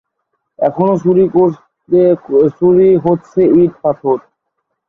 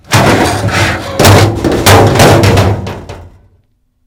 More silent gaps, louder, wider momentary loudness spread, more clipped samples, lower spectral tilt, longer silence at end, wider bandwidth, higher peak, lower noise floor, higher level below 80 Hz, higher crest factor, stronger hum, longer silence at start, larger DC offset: neither; second, -12 LUFS vs -7 LUFS; about the same, 8 LU vs 9 LU; second, under 0.1% vs 3%; first, -10.5 dB/octave vs -5 dB/octave; about the same, 0.7 s vs 0.8 s; second, 3.9 kHz vs over 20 kHz; about the same, -2 dBFS vs 0 dBFS; first, -71 dBFS vs -54 dBFS; second, -52 dBFS vs -26 dBFS; about the same, 12 dB vs 8 dB; neither; first, 0.6 s vs 0.1 s; neither